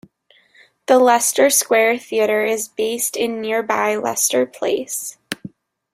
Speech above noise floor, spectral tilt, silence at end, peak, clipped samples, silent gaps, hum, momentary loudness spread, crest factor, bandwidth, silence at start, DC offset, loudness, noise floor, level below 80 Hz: 38 dB; -1.5 dB/octave; 0.45 s; -2 dBFS; under 0.1%; none; none; 13 LU; 18 dB; 16 kHz; 0.9 s; under 0.1%; -17 LUFS; -56 dBFS; -66 dBFS